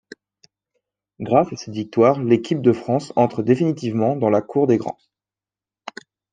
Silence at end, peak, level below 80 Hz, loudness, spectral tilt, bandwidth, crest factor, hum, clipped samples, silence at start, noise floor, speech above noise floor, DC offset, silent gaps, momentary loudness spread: 1.4 s; -2 dBFS; -64 dBFS; -19 LUFS; -7.5 dB/octave; 9.2 kHz; 18 dB; none; under 0.1%; 1.2 s; under -90 dBFS; over 71 dB; under 0.1%; none; 19 LU